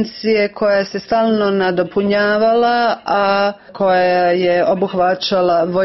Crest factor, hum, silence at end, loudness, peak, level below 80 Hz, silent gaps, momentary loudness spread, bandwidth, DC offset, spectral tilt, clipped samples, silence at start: 12 dB; none; 0 s; -15 LUFS; -4 dBFS; -54 dBFS; none; 4 LU; 6 kHz; 0.1%; -6.5 dB/octave; under 0.1%; 0 s